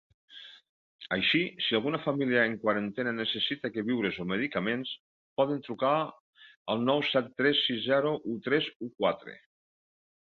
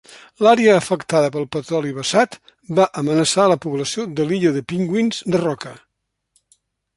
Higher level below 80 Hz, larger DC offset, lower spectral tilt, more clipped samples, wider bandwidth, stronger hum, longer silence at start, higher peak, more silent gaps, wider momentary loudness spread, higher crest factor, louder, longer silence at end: second, -70 dBFS vs -60 dBFS; neither; first, -7 dB/octave vs -5 dB/octave; neither; second, 6.6 kHz vs 11.5 kHz; neither; first, 0.3 s vs 0.1 s; second, -12 dBFS vs -2 dBFS; first, 0.69-0.99 s, 5.00-5.36 s, 6.20-6.33 s, 6.57-6.65 s, 8.76-8.80 s vs none; first, 13 LU vs 9 LU; about the same, 18 dB vs 18 dB; second, -29 LUFS vs -18 LUFS; second, 0.85 s vs 1.2 s